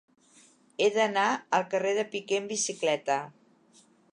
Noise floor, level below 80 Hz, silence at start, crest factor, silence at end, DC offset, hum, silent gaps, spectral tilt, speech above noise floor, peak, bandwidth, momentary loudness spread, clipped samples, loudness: -61 dBFS; -84 dBFS; 0.8 s; 20 dB; 0.8 s; under 0.1%; none; none; -2.5 dB/octave; 33 dB; -10 dBFS; 11 kHz; 6 LU; under 0.1%; -28 LUFS